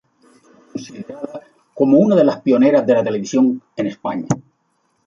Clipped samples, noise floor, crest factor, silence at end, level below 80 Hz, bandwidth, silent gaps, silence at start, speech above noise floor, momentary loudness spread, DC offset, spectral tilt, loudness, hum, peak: under 0.1%; -65 dBFS; 16 dB; 0.65 s; -62 dBFS; 7.6 kHz; none; 0.75 s; 49 dB; 19 LU; under 0.1%; -7 dB/octave; -16 LUFS; none; -2 dBFS